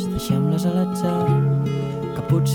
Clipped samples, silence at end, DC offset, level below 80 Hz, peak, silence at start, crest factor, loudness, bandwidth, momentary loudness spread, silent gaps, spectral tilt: under 0.1%; 0 s; under 0.1%; -44 dBFS; -8 dBFS; 0 s; 12 dB; -21 LUFS; 17.5 kHz; 6 LU; none; -7.5 dB/octave